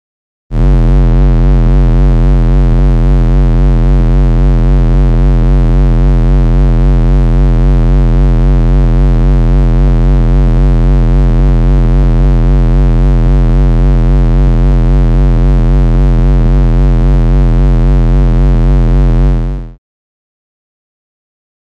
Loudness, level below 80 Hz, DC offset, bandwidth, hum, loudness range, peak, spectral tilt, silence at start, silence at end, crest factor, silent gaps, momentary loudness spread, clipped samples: -10 LUFS; -8 dBFS; under 0.1%; 4.2 kHz; none; 1 LU; 0 dBFS; -9.5 dB/octave; 0.5 s; 2.05 s; 6 dB; none; 1 LU; under 0.1%